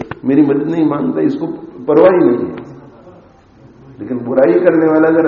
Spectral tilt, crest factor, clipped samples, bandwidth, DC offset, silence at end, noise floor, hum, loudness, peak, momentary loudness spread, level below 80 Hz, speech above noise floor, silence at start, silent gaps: -7.5 dB/octave; 14 dB; under 0.1%; 4.6 kHz; under 0.1%; 0 s; -43 dBFS; none; -13 LUFS; 0 dBFS; 15 LU; -54 dBFS; 31 dB; 0 s; none